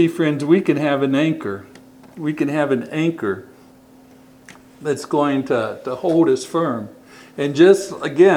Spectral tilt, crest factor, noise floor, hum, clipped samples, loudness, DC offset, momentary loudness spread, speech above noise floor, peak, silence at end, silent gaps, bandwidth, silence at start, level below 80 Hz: -6.5 dB/octave; 18 dB; -47 dBFS; none; under 0.1%; -19 LUFS; under 0.1%; 14 LU; 29 dB; 0 dBFS; 0 s; none; 15 kHz; 0 s; -64 dBFS